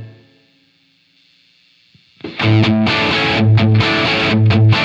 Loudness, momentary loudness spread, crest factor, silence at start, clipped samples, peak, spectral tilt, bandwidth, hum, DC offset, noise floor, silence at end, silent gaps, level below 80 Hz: -13 LUFS; 5 LU; 14 dB; 0 s; under 0.1%; -2 dBFS; -7 dB/octave; 7.4 kHz; none; under 0.1%; -56 dBFS; 0 s; none; -46 dBFS